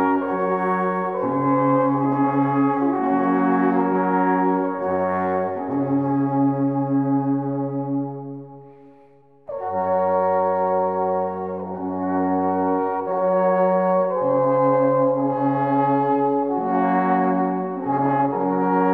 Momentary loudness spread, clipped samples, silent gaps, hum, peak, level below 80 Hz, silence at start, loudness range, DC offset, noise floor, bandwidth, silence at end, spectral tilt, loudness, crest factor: 7 LU; under 0.1%; none; none; -6 dBFS; -70 dBFS; 0 s; 4 LU; 0.1%; -52 dBFS; 3.6 kHz; 0 s; -11 dB/octave; -21 LUFS; 14 dB